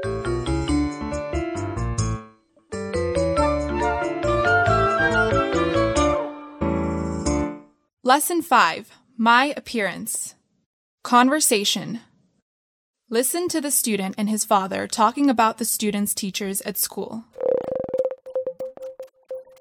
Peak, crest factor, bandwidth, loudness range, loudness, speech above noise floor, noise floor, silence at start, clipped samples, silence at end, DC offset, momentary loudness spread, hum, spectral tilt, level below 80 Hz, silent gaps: -4 dBFS; 20 dB; 19.5 kHz; 5 LU; -22 LUFS; 29 dB; -51 dBFS; 0 s; under 0.1%; 0.2 s; under 0.1%; 15 LU; none; -4 dB/octave; -40 dBFS; 7.93-7.97 s, 10.66-10.98 s, 12.42-12.94 s